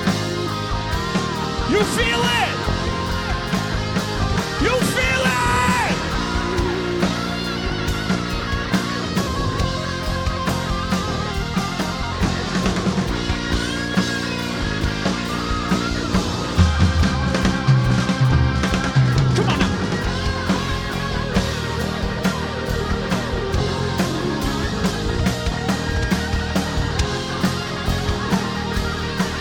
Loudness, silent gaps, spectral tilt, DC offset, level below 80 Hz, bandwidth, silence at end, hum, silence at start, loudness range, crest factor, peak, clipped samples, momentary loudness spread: -21 LUFS; none; -5 dB/octave; under 0.1%; -30 dBFS; 19 kHz; 0 s; none; 0 s; 4 LU; 18 dB; -2 dBFS; under 0.1%; 6 LU